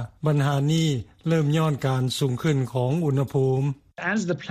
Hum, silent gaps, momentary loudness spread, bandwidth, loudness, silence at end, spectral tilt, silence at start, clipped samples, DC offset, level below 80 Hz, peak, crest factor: none; none; 4 LU; 14.5 kHz; -24 LUFS; 0 s; -6.5 dB/octave; 0 s; under 0.1%; under 0.1%; -56 dBFS; -10 dBFS; 14 dB